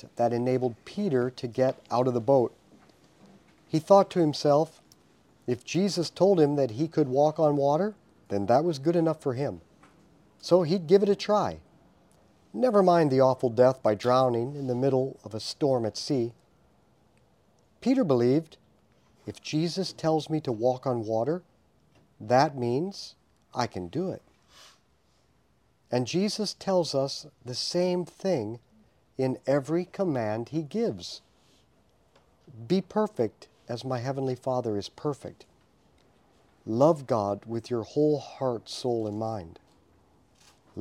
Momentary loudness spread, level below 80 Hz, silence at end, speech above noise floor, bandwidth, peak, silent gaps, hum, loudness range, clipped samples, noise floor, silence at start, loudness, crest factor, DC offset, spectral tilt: 13 LU; -68 dBFS; 0 s; 41 dB; 14.5 kHz; -6 dBFS; none; none; 8 LU; under 0.1%; -67 dBFS; 0.05 s; -27 LUFS; 22 dB; under 0.1%; -6.5 dB/octave